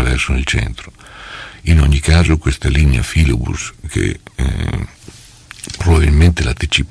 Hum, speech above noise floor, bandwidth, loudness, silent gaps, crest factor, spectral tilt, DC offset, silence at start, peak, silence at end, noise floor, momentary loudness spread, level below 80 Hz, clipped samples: none; 25 dB; 11 kHz; -15 LUFS; none; 14 dB; -5.5 dB/octave; under 0.1%; 0 s; 0 dBFS; 0.05 s; -39 dBFS; 18 LU; -18 dBFS; under 0.1%